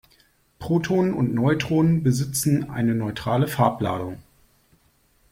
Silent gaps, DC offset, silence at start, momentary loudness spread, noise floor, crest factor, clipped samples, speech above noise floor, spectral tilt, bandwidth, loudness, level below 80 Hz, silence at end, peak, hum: none; under 0.1%; 0.6 s; 8 LU; -62 dBFS; 20 dB; under 0.1%; 40 dB; -6.5 dB/octave; 16.5 kHz; -22 LUFS; -52 dBFS; 1.1 s; -4 dBFS; none